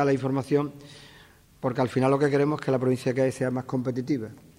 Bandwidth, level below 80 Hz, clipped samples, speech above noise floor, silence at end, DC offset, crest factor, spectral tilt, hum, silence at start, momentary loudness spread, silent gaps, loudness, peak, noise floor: 15.5 kHz; -64 dBFS; under 0.1%; 28 dB; 0.2 s; under 0.1%; 16 dB; -7.5 dB/octave; none; 0 s; 9 LU; none; -26 LUFS; -10 dBFS; -54 dBFS